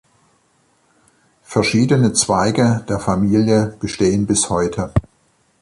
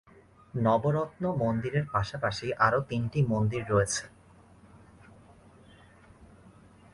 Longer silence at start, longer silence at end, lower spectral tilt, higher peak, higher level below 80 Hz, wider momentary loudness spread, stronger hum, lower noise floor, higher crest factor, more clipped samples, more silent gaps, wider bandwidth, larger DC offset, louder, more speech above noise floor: first, 1.5 s vs 0.55 s; first, 0.6 s vs 0.45 s; about the same, -5 dB/octave vs -6 dB/octave; first, -2 dBFS vs -10 dBFS; first, -40 dBFS vs -54 dBFS; about the same, 7 LU vs 6 LU; neither; about the same, -60 dBFS vs -57 dBFS; about the same, 16 dB vs 20 dB; neither; neither; about the same, 11.5 kHz vs 11.5 kHz; neither; first, -17 LUFS vs -29 LUFS; first, 44 dB vs 29 dB